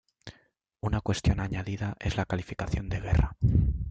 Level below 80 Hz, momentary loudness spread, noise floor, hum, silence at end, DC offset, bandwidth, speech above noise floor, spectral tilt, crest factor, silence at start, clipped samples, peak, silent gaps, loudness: -36 dBFS; 10 LU; -66 dBFS; none; 0 s; under 0.1%; 8.8 kHz; 38 dB; -6.5 dB/octave; 18 dB; 0.25 s; under 0.1%; -10 dBFS; none; -30 LUFS